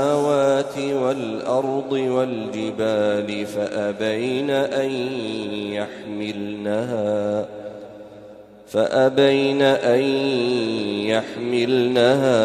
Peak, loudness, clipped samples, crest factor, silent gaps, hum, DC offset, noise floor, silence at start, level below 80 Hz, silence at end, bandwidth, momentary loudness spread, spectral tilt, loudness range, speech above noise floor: -4 dBFS; -21 LUFS; under 0.1%; 16 dB; none; none; under 0.1%; -43 dBFS; 0 s; -64 dBFS; 0 s; 13 kHz; 11 LU; -5.5 dB/octave; 7 LU; 22 dB